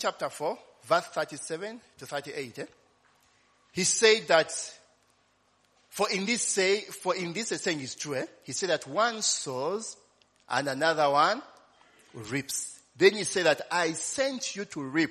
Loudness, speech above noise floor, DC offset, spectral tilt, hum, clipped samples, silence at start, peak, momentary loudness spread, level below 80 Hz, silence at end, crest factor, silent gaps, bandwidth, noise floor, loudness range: -28 LUFS; 40 dB; under 0.1%; -2.5 dB/octave; none; under 0.1%; 0 s; -6 dBFS; 15 LU; -76 dBFS; 0 s; 24 dB; none; 13.5 kHz; -68 dBFS; 3 LU